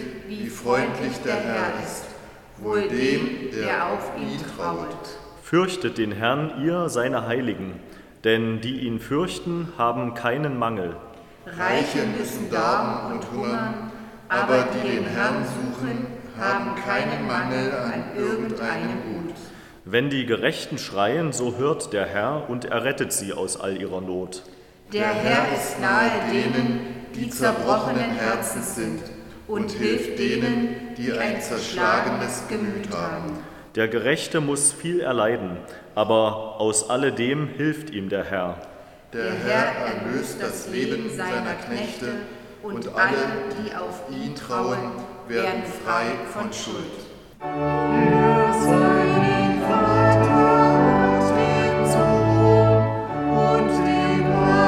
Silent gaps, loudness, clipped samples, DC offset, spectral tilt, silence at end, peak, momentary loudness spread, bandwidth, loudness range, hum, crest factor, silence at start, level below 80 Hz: none; -23 LUFS; under 0.1%; under 0.1%; -5 dB/octave; 0 s; -4 dBFS; 14 LU; 17 kHz; 9 LU; none; 20 dB; 0 s; -48 dBFS